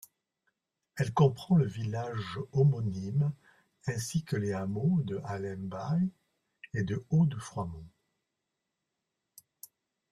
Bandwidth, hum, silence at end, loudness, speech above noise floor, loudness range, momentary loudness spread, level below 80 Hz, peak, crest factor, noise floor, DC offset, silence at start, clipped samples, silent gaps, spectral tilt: 14 kHz; none; 2.25 s; -31 LUFS; 55 dB; 5 LU; 12 LU; -64 dBFS; -12 dBFS; 20 dB; -85 dBFS; under 0.1%; 0.95 s; under 0.1%; none; -7.5 dB/octave